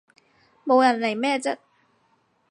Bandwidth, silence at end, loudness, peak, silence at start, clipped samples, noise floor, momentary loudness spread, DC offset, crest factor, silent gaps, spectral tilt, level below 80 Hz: 11 kHz; 0.95 s; -22 LUFS; -6 dBFS; 0.65 s; under 0.1%; -66 dBFS; 16 LU; under 0.1%; 20 dB; none; -3.5 dB/octave; -82 dBFS